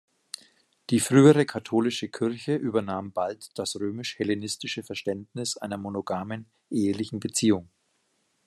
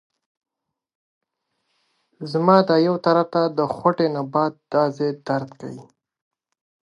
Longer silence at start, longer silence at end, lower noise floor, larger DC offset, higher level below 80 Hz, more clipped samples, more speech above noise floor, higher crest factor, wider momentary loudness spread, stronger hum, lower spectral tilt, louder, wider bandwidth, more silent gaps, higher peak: second, 0.9 s vs 2.2 s; second, 0.8 s vs 1 s; about the same, -72 dBFS vs -75 dBFS; neither; about the same, -72 dBFS vs -70 dBFS; neither; second, 46 dB vs 55 dB; about the same, 22 dB vs 22 dB; second, 12 LU vs 19 LU; neither; second, -5 dB/octave vs -8 dB/octave; second, -26 LUFS vs -20 LUFS; first, 13 kHz vs 10.5 kHz; neither; about the same, -4 dBFS vs -2 dBFS